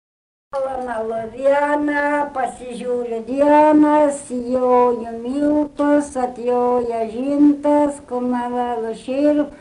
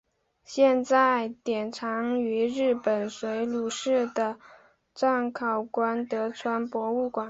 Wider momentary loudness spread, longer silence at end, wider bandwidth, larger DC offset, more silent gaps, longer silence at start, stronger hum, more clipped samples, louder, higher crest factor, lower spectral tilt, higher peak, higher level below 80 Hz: about the same, 11 LU vs 9 LU; about the same, 0.05 s vs 0 s; first, 11 kHz vs 8 kHz; neither; neither; about the same, 0.55 s vs 0.5 s; neither; neither; first, -18 LUFS vs -27 LUFS; about the same, 14 dB vs 18 dB; about the same, -5.5 dB/octave vs -4.5 dB/octave; first, -4 dBFS vs -8 dBFS; first, -52 dBFS vs -70 dBFS